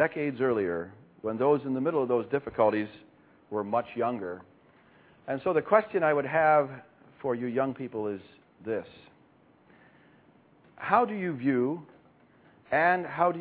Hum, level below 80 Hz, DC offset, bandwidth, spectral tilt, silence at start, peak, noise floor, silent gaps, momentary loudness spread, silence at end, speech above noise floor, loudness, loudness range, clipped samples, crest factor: none; -68 dBFS; under 0.1%; 4 kHz; -10.5 dB/octave; 0 s; -8 dBFS; -61 dBFS; none; 15 LU; 0 s; 33 dB; -28 LUFS; 8 LU; under 0.1%; 22 dB